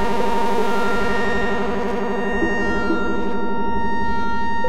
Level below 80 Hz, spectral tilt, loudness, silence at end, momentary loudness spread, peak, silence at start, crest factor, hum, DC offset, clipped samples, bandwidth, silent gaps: -36 dBFS; -6 dB/octave; -22 LUFS; 0 s; 3 LU; -6 dBFS; 0 s; 12 dB; none; 10%; under 0.1%; 16 kHz; none